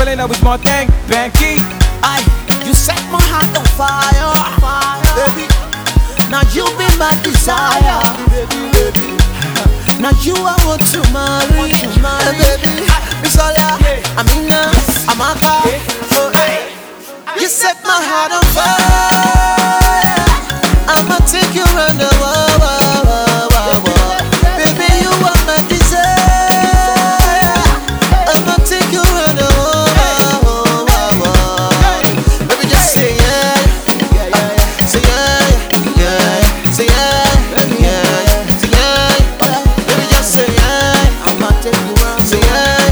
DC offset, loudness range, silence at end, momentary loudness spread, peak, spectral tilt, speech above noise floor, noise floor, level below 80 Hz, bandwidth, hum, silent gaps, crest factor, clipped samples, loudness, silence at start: under 0.1%; 2 LU; 0 s; 4 LU; 0 dBFS; -4 dB/octave; 20 dB; -30 dBFS; -14 dBFS; over 20 kHz; none; none; 10 dB; 0.1%; -11 LUFS; 0 s